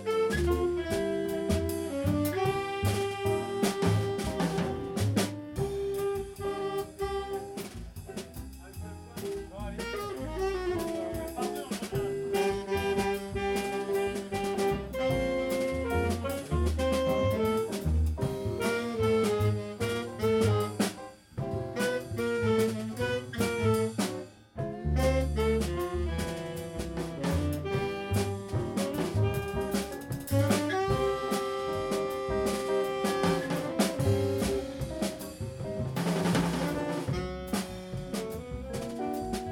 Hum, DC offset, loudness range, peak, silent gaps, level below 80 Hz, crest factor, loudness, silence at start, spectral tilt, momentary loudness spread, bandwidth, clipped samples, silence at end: none; under 0.1%; 5 LU; -14 dBFS; none; -42 dBFS; 18 dB; -31 LUFS; 0 s; -6 dB/octave; 9 LU; 18 kHz; under 0.1%; 0 s